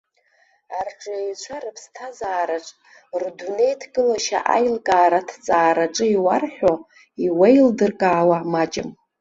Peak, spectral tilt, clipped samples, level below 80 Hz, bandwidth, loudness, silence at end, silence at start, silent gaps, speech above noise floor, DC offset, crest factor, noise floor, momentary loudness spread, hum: -2 dBFS; -5 dB/octave; under 0.1%; -60 dBFS; 8 kHz; -20 LUFS; 0.3 s; 0.7 s; none; 42 dB; under 0.1%; 18 dB; -61 dBFS; 15 LU; none